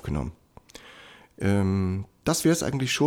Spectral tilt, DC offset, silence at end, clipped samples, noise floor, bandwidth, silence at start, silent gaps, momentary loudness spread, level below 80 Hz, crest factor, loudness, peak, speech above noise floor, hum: -5 dB/octave; under 0.1%; 0 s; under 0.1%; -50 dBFS; 18.5 kHz; 0.05 s; none; 23 LU; -46 dBFS; 18 dB; -26 LUFS; -10 dBFS; 26 dB; none